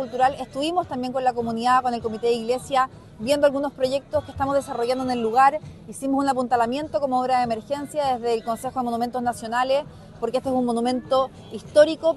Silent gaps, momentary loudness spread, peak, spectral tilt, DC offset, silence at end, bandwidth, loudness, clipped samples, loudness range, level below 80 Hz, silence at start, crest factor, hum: none; 8 LU; -4 dBFS; -5 dB/octave; under 0.1%; 0 s; 13 kHz; -23 LUFS; under 0.1%; 2 LU; -54 dBFS; 0 s; 18 dB; none